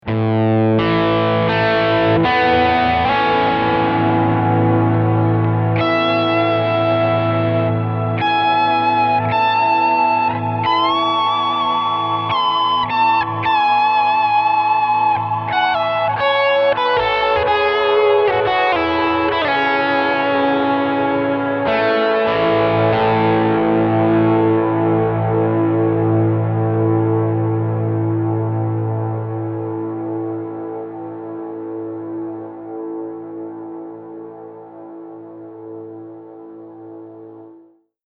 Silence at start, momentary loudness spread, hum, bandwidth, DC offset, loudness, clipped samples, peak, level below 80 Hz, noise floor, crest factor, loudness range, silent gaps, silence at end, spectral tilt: 0.05 s; 16 LU; none; 6 kHz; under 0.1%; -16 LUFS; under 0.1%; -4 dBFS; -48 dBFS; -49 dBFS; 12 dB; 14 LU; none; 0.55 s; -8.5 dB/octave